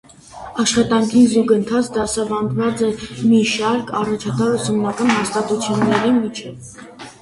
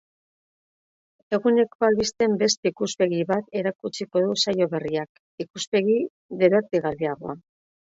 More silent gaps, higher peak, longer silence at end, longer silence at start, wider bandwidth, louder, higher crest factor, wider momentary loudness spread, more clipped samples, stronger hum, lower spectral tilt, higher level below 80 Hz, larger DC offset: second, none vs 1.75-1.79 s, 2.57-2.63 s, 5.09-5.38 s, 5.67-5.72 s, 6.10-6.29 s; first, -2 dBFS vs -6 dBFS; second, 0.1 s vs 0.55 s; second, 0.3 s vs 1.3 s; first, 11.5 kHz vs 8 kHz; first, -17 LUFS vs -23 LUFS; about the same, 16 dB vs 18 dB; first, 16 LU vs 12 LU; neither; neither; about the same, -5 dB/octave vs -4.5 dB/octave; first, -50 dBFS vs -64 dBFS; neither